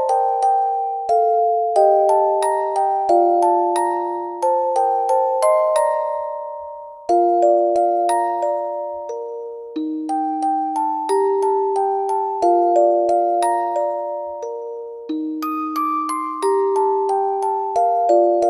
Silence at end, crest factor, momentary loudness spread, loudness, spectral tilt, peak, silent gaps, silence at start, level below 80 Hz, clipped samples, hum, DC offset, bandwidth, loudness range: 0 s; 14 dB; 12 LU; -19 LUFS; -3.5 dB/octave; -4 dBFS; none; 0 s; -68 dBFS; under 0.1%; none; under 0.1%; 16 kHz; 5 LU